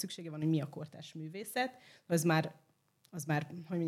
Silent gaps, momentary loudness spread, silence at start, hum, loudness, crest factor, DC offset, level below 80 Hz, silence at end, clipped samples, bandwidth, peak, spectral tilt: none; 15 LU; 0 s; none; -36 LUFS; 20 dB; under 0.1%; -84 dBFS; 0 s; under 0.1%; 15.5 kHz; -18 dBFS; -5.5 dB/octave